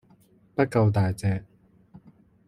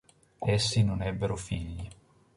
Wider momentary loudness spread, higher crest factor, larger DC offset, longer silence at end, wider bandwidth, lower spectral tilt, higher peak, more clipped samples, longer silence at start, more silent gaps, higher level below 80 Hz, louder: second, 11 LU vs 15 LU; about the same, 20 dB vs 18 dB; neither; about the same, 0.5 s vs 0.45 s; about the same, 12 kHz vs 11.5 kHz; first, -8 dB/octave vs -5 dB/octave; first, -6 dBFS vs -12 dBFS; neither; first, 0.6 s vs 0.4 s; neither; second, -56 dBFS vs -46 dBFS; first, -25 LUFS vs -30 LUFS